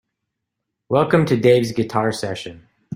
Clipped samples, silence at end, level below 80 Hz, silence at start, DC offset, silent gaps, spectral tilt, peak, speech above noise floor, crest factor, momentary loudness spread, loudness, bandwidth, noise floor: under 0.1%; 0 s; -54 dBFS; 0.9 s; under 0.1%; none; -6.5 dB/octave; -2 dBFS; 62 dB; 18 dB; 13 LU; -18 LUFS; 16 kHz; -79 dBFS